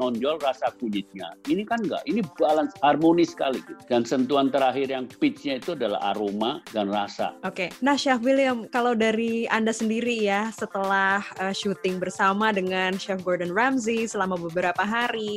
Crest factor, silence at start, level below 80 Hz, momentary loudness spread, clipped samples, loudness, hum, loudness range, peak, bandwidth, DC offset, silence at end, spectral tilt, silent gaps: 18 dB; 0 s; -66 dBFS; 7 LU; under 0.1%; -25 LUFS; none; 2 LU; -6 dBFS; 15.5 kHz; under 0.1%; 0 s; -4.5 dB/octave; none